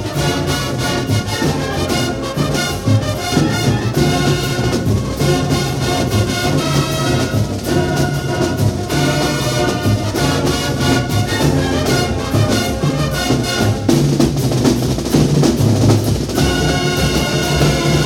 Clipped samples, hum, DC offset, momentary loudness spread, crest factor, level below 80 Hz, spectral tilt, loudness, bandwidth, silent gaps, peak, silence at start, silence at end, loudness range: under 0.1%; none; under 0.1%; 4 LU; 14 dB; -30 dBFS; -5 dB/octave; -16 LUFS; 17.5 kHz; none; -2 dBFS; 0 s; 0 s; 2 LU